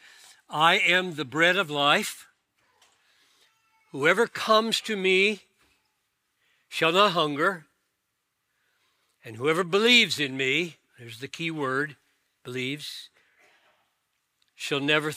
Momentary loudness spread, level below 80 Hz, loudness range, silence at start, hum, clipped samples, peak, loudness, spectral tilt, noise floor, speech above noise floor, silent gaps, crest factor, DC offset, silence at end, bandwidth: 19 LU; -82 dBFS; 9 LU; 0.5 s; none; under 0.1%; -4 dBFS; -23 LUFS; -3.5 dB/octave; -78 dBFS; 54 dB; none; 22 dB; under 0.1%; 0 s; 16 kHz